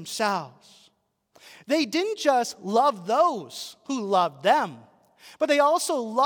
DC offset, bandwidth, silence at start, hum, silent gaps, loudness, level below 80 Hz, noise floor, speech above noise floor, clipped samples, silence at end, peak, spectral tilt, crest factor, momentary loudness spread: under 0.1%; 18 kHz; 0 s; none; none; -24 LUFS; -84 dBFS; -67 dBFS; 42 dB; under 0.1%; 0 s; -8 dBFS; -3.5 dB/octave; 18 dB; 11 LU